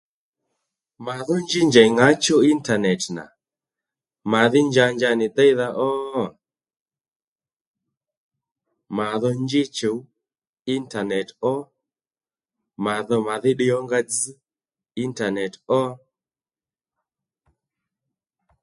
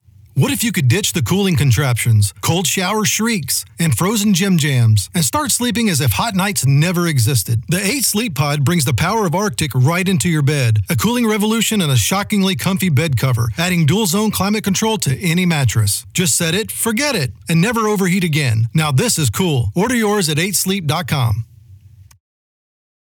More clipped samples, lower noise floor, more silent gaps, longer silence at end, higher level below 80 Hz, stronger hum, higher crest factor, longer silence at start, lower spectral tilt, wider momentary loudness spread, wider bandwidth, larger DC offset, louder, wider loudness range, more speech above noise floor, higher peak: neither; first, under -90 dBFS vs -42 dBFS; first, 6.80-6.86 s, 7.16-7.36 s, 7.56-7.74 s, 7.97-8.01 s, 8.17-8.31 s, 10.49-10.53 s, 10.61-10.65 s vs none; first, 2.65 s vs 1.1 s; second, -66 dBFS vs -48 dBFS; neither; first, 22 dB vs 12 dB; first, 1 s vs 0.35 s; about the same, -4.5 dB/octave vs -4.5 dB/octave; first, 14 LU vs 3 LU; second, 11.5 kHz vs over 20 kHz; neither; second, -21 LUFS vs -16 LUFS; first, 10 LU vs 1 LU; first, over 70 dB vs 27 dB; first, 0 dBFS vs -4 dBFS